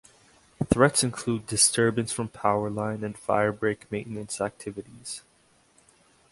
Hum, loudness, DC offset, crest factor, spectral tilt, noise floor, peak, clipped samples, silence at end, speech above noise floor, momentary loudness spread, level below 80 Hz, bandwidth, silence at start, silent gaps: none; -26 LUFS; under 0.1%; 24 dB; -3.5 dB/octave; -63 dBFS; -4 dBFS; under 0.1%; 1.15 s; 36 dB; 17 LU; -54 dBFS; 12 kHz; 0.6 s; none